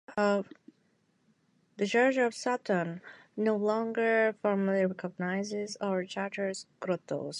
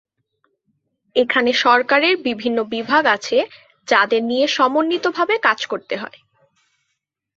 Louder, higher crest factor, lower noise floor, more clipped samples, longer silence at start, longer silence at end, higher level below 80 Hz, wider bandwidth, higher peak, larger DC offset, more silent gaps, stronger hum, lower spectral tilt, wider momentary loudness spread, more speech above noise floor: second, -31 LUFS vs -17 LUFS; about the same, 18 dB vs 20 dB; second, -71 dBFS vs -75 dBFS; neither; second, 0.1 s vs 1.15 s; second, 0 s vs 1.3 s; second, -82 dBFS vs -68 dBFS; first, 11 kHz vs 7.8 kHz; second, -14 dBFS vs 0 dBFS; neither; neither; neither; first, -5.5 dB/octave vs -3 dB/octave; about the same, 9 LU vs 11 LU; second, 41 dB vs 58 dB